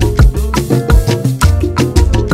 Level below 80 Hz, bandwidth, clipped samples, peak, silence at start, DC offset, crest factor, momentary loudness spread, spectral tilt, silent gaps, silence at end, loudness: -14 dBFS; 16 kHz; under 0.1%; 0 dBFS; 0 s; under 0.1%; 10 dB; 3 LU; -6 dB/octave; none; 0 s; -12 LUFS